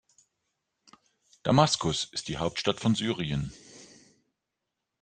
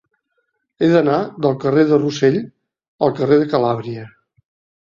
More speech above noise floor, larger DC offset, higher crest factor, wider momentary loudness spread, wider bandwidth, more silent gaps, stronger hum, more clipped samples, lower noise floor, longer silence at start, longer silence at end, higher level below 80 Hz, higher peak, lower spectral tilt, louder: first, 58 dB vs 54 dB; neither; first, 24 dB vs 16 dB; first, 15 LU vs 10 LU; first, 9.8 kHz vs 7.4 kHz; second, none vs 2.88-2.98 s; neither; neither; first, -85 dBFS vs -70 dBFS; first, 1.45 s vs 0.8 s; first, 1.15 s vs 0.75 s; about the same, -56 dBFS vs -58 dBFS; second, -6 dBFS vs -2 dBFS; second, -4.5 dB/octave vs -7.5 dB/octave; second, -28 LUFS vs -17 LUFS